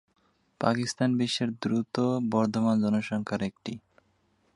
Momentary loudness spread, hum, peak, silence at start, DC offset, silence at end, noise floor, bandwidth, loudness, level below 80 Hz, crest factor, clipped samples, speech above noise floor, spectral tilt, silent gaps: 8 LU; none; -8 dBFS; 0.6 s; under 0.1%; 0.75 s; -69 dBFS; 11.5 kHz; -28 LUFS; -66 dBFS; 22 dB; under 0.1%; 42 dB; -6 dB/octave; none